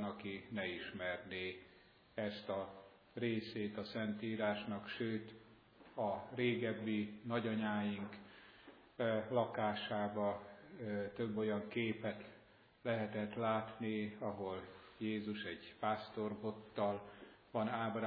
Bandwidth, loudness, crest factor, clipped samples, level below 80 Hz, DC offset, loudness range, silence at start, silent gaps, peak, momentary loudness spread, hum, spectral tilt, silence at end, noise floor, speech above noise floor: 5.2 kHz; -42 LUFS; 20 dB; under 0.1%; -78 dBFS; under 0.1%; 3 LU; 0 s; none; -22 dBFS; 13 LU; none; -4.5 dB/octave; 0 s; -66 dBFS; 25 dB